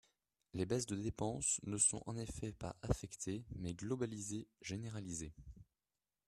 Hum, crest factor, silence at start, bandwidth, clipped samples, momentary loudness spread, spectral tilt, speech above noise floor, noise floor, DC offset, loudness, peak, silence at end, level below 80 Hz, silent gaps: none; 22 dB; 0.55 s; 13.5 kHz; under 0.1%; 13 LU; -4.5 dB/octave; over 48 dB; under -90 dBFS; under 0.1%; -41 LUFS; -20 dBFS; 0.65 s; -58 dBFS; none